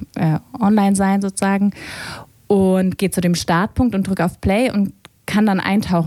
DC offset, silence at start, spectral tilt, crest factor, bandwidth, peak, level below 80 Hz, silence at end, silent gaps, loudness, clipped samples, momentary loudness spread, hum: under 0.1%; 0 s; -6 dB/octave; 16 dB; 14 kHz; -2 dBFS; -40 dBFS; 0 s; none; -18 LUFS; under 0.1%; 11 LU; none